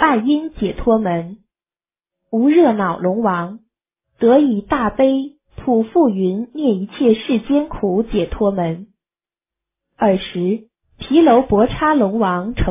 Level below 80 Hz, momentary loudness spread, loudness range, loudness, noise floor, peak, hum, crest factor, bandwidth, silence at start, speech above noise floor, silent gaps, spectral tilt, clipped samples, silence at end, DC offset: -38 dBFS; 11 LU; 4 LU; -17 LUFS; under -90 dBFS; -2 dBFS; none; 16 dB; 3.8 kHz; 0 s; over 74 dB; none; -11 dB/octave; under 0.1%; 0 s; under 0.1%